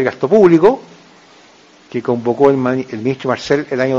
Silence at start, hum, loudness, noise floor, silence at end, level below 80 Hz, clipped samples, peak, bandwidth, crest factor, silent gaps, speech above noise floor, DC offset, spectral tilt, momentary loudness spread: 0 s; none; -14 LUFS; -45 dBFS; 0 s; -54 dBFS; under 0.1%; 0 dBFS; 7.6 kHz; 14 dB; none; 32 dB; under 0.1%; -7 dB/octave; 12 LU